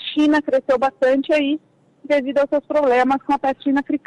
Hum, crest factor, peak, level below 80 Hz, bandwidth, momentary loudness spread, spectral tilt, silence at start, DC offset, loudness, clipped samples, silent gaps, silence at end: none; 8 dB; -10 dBFS; -58 dBFS; 10 kHz; 5 LU; -4.5 dB/octave; 0 s; under 0.1%; -19 LUFS; under 0.1%; none; 0.1 s